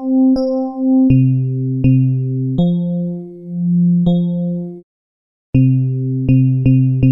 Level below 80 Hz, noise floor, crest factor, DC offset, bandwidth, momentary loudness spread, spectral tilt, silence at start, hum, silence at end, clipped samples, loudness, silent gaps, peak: -38 dBFS; under -90 dBFS; 12 dB; under 0.1%; 5.8 kHz; 9 LU; -12.5 dB/octave; 0 s; none; 0 s; under 0.1%; -15 LUFS; 4.83-5.53 s; -2 dBFS